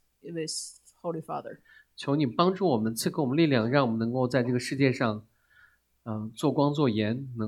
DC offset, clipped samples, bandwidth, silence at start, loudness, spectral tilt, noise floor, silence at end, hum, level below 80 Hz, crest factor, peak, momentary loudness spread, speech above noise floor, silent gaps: under 0.1%; under 0.1%; 16 kHz; 0.25 s; -28 LUFS; -6 dB/octave; -62 dBFS; 0 s; none; -68 dBFS; 20 dB; -8 dBFS; 14 LU; 35 dB; none